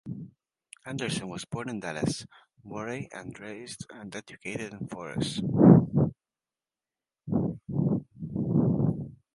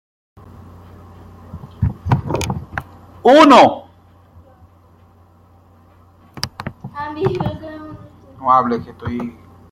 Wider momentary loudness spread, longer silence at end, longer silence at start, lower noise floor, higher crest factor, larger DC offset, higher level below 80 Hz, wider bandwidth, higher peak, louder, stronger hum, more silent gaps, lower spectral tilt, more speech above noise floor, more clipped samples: second, 21 LU vs 24 LU; second, 0.2 s vs 0.4 s; second, 0.05 s vs 1.55 s; first, under -90 dBFS vs -49 dBFS; first, 26 dB vs 18 dB; neither; second, -56 dBFS vs -42 dBFS; second, 11.5 kHz vs 16 kHz; about the same, -2 dBFS vs 0 dBFS; second, -28 LUFS vs -15 LUFS; neither; neither; about the same, -7 dB/octave vs -6 dB/octave; first, over 63 dB vs 37 dB; neither